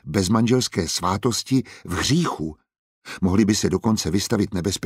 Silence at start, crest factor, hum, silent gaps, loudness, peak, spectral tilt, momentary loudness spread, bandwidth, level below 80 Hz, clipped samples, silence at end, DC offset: 0.05 s; 18 dB; none; 2.79-3.02 s; -22 LUFS; -4 dBFS; -5 dB/octave; 7 LU; 16 kHz; -46 dBFS; under 0.1%; 0 s; under 0.1%